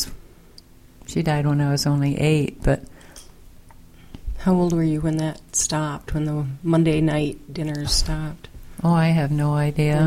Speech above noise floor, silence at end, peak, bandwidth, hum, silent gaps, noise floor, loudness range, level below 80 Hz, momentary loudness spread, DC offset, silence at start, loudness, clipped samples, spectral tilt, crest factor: 27 dB; 0 s; -6 dBFS; 15 kHz; none; none; -47 dBFS; 2 LU; -36 dBFS; 10 LU; under 0.1%; 0 s; -22 LUFS; under 0.1%; -5.5 dB/octave; 16 dB